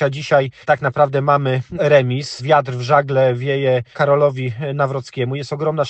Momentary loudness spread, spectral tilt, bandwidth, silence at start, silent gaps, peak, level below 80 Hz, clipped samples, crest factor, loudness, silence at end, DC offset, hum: 8 LU; -6.5 dB/octave; 8.6 kHz; 0 s; none; 0 dBFS; -56 dBFS; under 0.1%; 16 dB; -17 LUFS; 0 s; under 0.1%; none